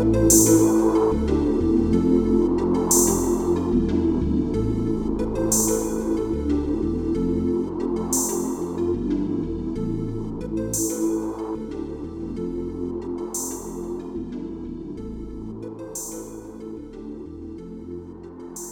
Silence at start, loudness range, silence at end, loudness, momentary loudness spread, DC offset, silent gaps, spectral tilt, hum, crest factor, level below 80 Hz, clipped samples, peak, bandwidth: 0 s; 14 LU; 0 s; -23 LUFS; 18 LU; under 0.1%; none; -5.5 dB/octave; none; 20 dB; -36 dBFS; under 0.1%; -4 dBFS; 19 kHz